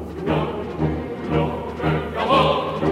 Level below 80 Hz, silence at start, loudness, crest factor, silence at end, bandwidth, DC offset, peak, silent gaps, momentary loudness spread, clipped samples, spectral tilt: -38 dBFS; 0 s; -22 LUFS; 18 dB; 0 s; 11.5 kHz; under 0.1%; -4 dBFS; none; 8 LU; under 0.1%; -7.5 dB/octave